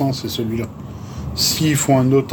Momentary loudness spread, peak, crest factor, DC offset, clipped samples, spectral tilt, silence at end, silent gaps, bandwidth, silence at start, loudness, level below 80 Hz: 15 LU; -2 dBFS; 16 dB; under 0.1%; under 0.1%; -4.5 dB/octave; 0 s; none; 19.5 kHz; 0 s; -18 LUFS; -40 dBFS